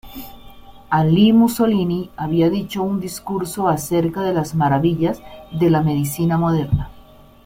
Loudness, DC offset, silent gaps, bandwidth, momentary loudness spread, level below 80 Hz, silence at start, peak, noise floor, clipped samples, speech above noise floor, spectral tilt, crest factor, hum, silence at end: -18 LUFS; under 0.1%; none; 16.5 kHz; 11 LU; -42 dBFS; 0.05 s; -4 dBFS; -44 dBFS; under 0.1%; 27 dB; -7 dB/octave; 14 dB; none; 0.45 s